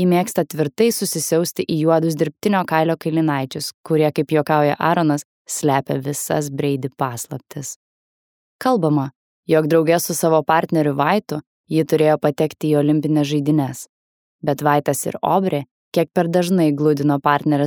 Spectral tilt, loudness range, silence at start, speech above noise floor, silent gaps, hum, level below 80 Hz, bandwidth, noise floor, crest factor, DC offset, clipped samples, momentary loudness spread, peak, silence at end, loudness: -5.5 dB/octave; 5 LU; 0 s; over 72 dB; 3.74-3.84 s, 5.25-5.45 s, 7.76-8.59 s, 9.16-9.43 s, 11.47-11.64 s, 13.89-14.39 s, 15.71-15.92 s; none; -66 dBFS; over 20 kHz; under -90 dBFS; 18 dB; under 0.1%; under 0.1%; 10 LU; -2 dBFS; 0 s; -19 LUFS